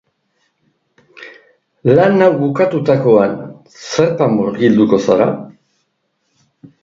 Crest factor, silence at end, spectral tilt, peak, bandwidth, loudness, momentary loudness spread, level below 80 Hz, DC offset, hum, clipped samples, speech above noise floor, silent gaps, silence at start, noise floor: 16 dB; 1.3 s; -7 dB/octave; 0 dBFS; 7.6 kHz; -13 LUFS; 17 LU; -56 dBFS; under 0.1%; none; under 0.1%; 55 dB; none; 1.2 s; -67 dBFS